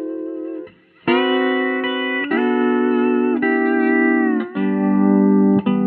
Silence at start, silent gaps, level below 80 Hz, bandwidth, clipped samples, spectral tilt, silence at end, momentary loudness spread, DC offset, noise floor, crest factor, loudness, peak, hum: 0 s; none; -66 dBFS; 4.5 kHz; under 0.1%; -9.5 dB/octave; 0 s; 12 LU; under 0.1%; -37 dBFS; 14 dB; -17 LUFS; -4 dBFS; none